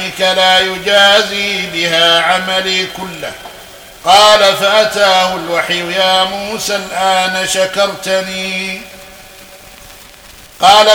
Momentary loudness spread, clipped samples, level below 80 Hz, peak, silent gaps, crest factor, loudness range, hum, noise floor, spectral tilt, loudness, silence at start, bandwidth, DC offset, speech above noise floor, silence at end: 14 LU; 0.4%; -48 dBFS; 0 dBFS; none; 12 dB; 6 LU; none; -37 dBFS; -1.5 dB/octave; -11 LUFS; 0 s; over 20 kHz; under 0.1%; 25 dB; 0 s